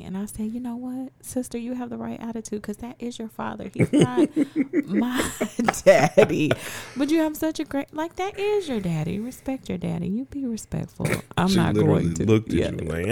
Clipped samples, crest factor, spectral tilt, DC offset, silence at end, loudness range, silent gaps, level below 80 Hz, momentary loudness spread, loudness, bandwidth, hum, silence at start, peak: under 0.1%; 22 dB; -6 dB/octave; 0.2%; 0 s; 8 LU; none; -50 dBFS; 13 LU; -24 LUFS; 19 kHz; none; 0 s; -2 dBFS